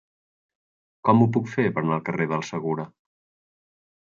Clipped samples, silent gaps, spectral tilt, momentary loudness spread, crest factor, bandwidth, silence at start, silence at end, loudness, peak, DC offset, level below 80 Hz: under 0.1%; none; -7.5 dB/octave; 10 LU; 20 dB; 7.2 kHz; 1.05 s; 1.2 s; -24 LUFS; -6 dBFS; under 0.1%; -66 dBFS